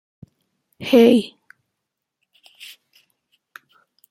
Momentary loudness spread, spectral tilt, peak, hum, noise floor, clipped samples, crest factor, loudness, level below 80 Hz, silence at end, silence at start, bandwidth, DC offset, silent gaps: 28 LU; -5.5 dB/octave; -2 dBFS; none; -81 dBFS; under 0.1%; 20 dB; -15 LUFS; -68 dBFS; 2.85 s; 0.8 s; 15 kHz; under 0.1%; none